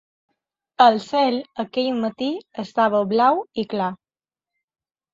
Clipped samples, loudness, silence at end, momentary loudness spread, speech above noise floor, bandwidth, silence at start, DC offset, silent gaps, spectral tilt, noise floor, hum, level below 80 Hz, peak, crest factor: under 0.1%; -21 LUFS; 1.2 s; 11 LU; over 70 dB; 7.8 kHz; 0.8 s; under 0.1%; none; -6 dB/octave; under -90 dBFS; none; -68 dBFS; -2 dBFS; 20 dB